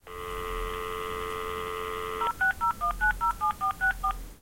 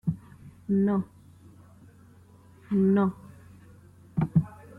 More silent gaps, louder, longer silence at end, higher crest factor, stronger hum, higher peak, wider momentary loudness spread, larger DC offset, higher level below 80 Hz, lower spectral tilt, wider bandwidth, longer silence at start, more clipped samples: neither; second, -30 LUFS vs -27 LUFS; second, 0.05 s vs 0.3 s; about the same, 14 dB vs 18 dB; neither; second, -16 dBFS vs -12 dBFS; second, 8 LU vs 18 LU; first, 0.1% vs under 0.1%; first, -42 dBFS vs -58 dBFS; second, -3.5 dB/octave vs -10.5 dB/octave; first, 16.5 kHz vs 4 kHz; about the same, 0.05 s vs 0.05 s; neither